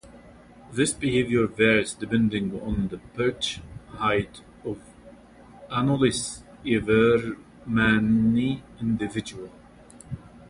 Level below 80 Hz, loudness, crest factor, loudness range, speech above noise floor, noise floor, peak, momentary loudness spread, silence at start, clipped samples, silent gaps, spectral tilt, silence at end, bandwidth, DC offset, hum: -48 dBFS; -24 LUFS; 18 dB; 6 LU; 25 dB; -49 dBFS; -6 dBFS; 18 LU; 0.05 s; under 0.1%; none; -5 dB/octave; 0.05 s; 11.5 kHz; under 0.1%; none